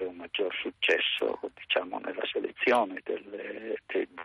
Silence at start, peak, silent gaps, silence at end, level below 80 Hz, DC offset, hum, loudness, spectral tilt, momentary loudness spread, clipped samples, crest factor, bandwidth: 0 s; -14 dBFS; none; 0 s; -74 dBFS; under 0.1%; none; -30 LUFS; -3 dB/octave; 11 LU; under 0.1%; 18 dB; 10.5 kHz